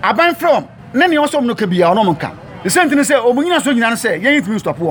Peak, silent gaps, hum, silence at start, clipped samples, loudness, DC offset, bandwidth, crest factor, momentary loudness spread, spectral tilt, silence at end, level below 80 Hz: 0 dBFS; none; none; 0 s; under 0.1%; -14 LUFS; under 0.1%; over 20 kHz; 12 dB; 7 LU; -4.5 dB/octave; 0 s; -52 dBFS